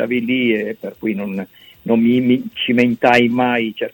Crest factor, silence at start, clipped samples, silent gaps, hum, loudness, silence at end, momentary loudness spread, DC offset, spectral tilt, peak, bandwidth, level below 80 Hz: 16 dB; 0 s; under 0.1%; none; none; -17 LUFS; 0.05 s; 13 LU; under 0.1%; -6.5 dB/octave; 0 dBFS; 17 kHz; -58 dBFS